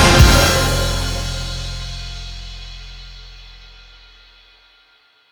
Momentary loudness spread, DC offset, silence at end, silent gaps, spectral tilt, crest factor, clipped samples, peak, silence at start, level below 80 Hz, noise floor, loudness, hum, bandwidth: 27 LU; under 0.1%; 1.65 s; none; -4 dB/octave; 18 dB; under 0.1%; 0 dBFS; 0 s; -24 dBFS; -54 dBFS; -16 LUFS; none; over 20 kHz